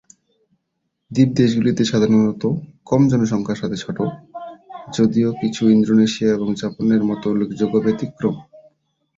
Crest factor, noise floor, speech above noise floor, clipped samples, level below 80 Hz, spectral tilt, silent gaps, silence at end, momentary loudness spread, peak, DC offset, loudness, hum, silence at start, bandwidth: 16 dB; -74 dBFS; 57 dB; under 0.1%; -54 dBFS; -7 dB/octave; none; 0.75 s; 11 LU; -2 dBFS; under 0.1%; -18 LUFS; none; 1.1 s; 7.6 kHz